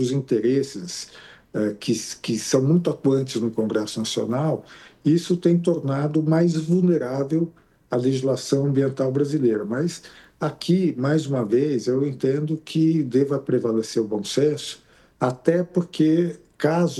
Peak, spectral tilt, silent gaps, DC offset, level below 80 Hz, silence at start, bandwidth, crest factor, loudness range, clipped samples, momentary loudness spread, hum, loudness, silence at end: -4 dBFS; -6.5 dB/octave; none; under 0.1%; -64 dBFS; 0 s; 12.5 kHz; 18 dB; 2 LU; under 0.1%; 8 LU; none; -23 LUFS; 0 s